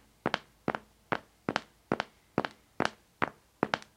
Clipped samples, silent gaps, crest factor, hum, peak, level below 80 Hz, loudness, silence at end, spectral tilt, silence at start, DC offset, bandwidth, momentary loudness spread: under 0.1%; none; 32 dB; none; -6 dBFS; -66 dBFS; -36 LUFS; 0.15 s; -5 dB/octave; 0.25 s; under 0.1%; 16.5 kHz; 3 LU